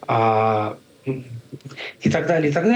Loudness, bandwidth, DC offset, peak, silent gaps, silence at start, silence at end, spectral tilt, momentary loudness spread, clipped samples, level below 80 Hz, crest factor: -21 LUFS; 10 kHz; under 0.1%; -6 dBFS; none; 0.1 s; 0 s; -7 dB/octave; 18 LU; under 0.1%; -58 dBFS; 14 dB